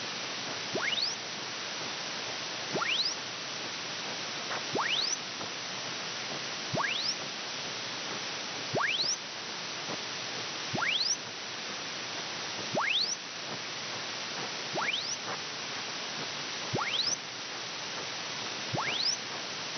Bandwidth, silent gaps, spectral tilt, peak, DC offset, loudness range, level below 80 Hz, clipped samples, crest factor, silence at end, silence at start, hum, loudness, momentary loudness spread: 6.8 kHz; none; -1 dB/octave; -20 dBFS; under 0.1%; 2 LU; -84 dBFS; under 0.1%; 16 dB; 0 s; 0 s; none; -32 LUFS; 7 LU